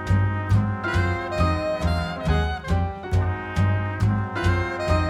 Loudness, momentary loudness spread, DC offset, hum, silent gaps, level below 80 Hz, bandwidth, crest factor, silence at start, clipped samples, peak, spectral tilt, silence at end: -24 LUFS; 3 LU; under 0.1%; none; none; -32 dBFS; 11 kHz; 14 dB; 0 s; under 0.1%; -8 dBFS; -7 dB/octave; 0 s